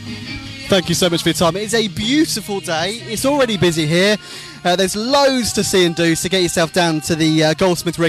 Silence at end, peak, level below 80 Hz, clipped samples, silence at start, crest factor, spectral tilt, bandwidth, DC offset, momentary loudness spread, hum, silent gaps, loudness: 0 s; -4 dBFS; -44 dBFS; under 0.1%; 0 s; 12 dB; -4 dB/octave; 15.5 kHz; under 0.1%; 7 LU; none; none; -16 LUFS